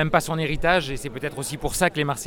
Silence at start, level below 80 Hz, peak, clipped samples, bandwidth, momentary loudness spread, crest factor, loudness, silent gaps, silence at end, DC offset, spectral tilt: 0 s; -38 dBFS; -4 dBFS; under 0.1%; 18.5 kHz; 9 LU; 20 dB; -24 LUFS; none; 0 s; under 0.1%; -4 dB/octave